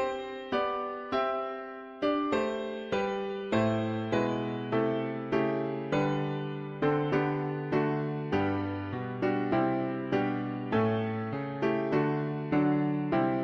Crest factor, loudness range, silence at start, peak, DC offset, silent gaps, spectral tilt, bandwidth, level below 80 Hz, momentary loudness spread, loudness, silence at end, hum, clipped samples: 16 dB; 1 LU; 0 s; -14 dBFS; under 0.1%; none; -8 dB/octave; 7.4 kHz; -62 dBFS; 6 LU; -31 LUFS; 0 s; none; under 0.1%